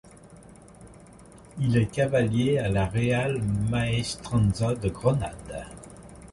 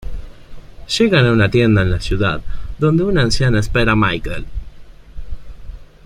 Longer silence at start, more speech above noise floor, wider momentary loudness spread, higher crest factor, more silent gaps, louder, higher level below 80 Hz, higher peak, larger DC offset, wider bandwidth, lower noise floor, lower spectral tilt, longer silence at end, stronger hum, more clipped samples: first, 0.25 s vs 0 s; about the same, 24 dB vs 21 dB; second, 16 LU vs 22 LU; about the same, 18 dB vs 16 dB; neither; second, -26 LUFS vs -15 LUFS; second, -44 dBFS vs -28 dBFS; second, -10 dBFS vs -2 dBFS; neither; about the same, 11.5 kHz vs 11.5 kHz; first, -49 dBFS vs -35 dBFS; about the same, -6.5 dB/octave vs -6 dB/octave; second, 0 s vs 0.2 s; neither; neither